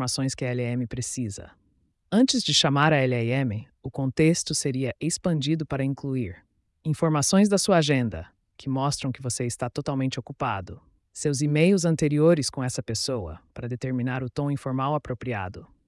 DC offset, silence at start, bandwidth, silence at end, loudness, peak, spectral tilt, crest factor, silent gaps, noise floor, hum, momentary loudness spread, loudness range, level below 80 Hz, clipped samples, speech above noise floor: under 0.1%; 0 s; 12 kHz; 0.2 s; -25 LUFS; -8 dBFS; -5 dB/octave; 16 dB; none; -68 dBFS; none; 13 LU; 5 LU; -56 dBFS; under 0.1%; 43 dB